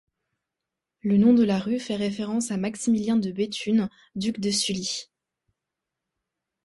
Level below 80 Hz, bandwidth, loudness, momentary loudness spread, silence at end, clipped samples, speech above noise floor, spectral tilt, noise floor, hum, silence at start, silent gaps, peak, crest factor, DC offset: -62 dBFS; 11.5 kHz; -25 LUFS; 11 LU; 1.6 s; under 0.1%; 62 dB; -5 dB/octave; -86 dBFS; none; 1.05 s; none; -10 dBFS; 16 dB; under 0.1%